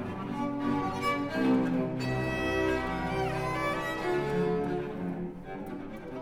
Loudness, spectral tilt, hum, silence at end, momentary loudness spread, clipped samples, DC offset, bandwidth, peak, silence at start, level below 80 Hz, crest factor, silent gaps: -31 LUFS; -6.5 dB/octave; none; 0 s; 12 LU; under 0.1%; under 0.1%; 17 kHz; -16 dBFS; 0 s; -50 dBFS; 14 dB; none